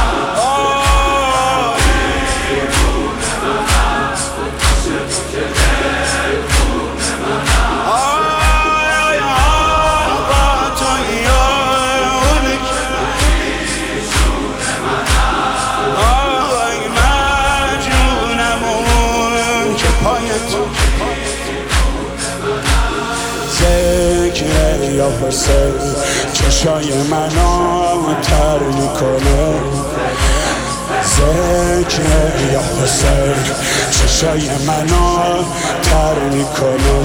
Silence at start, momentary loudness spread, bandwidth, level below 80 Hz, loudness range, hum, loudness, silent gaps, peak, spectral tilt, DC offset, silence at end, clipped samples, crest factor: 0 s; 5 LU; over 20 kHz; -18 dBFS; 3 LU; none; -14 LUFS; none; 0 dBFS; -4 dB/octave; under 0.1%; 0 s; under 0.1%; 14 dB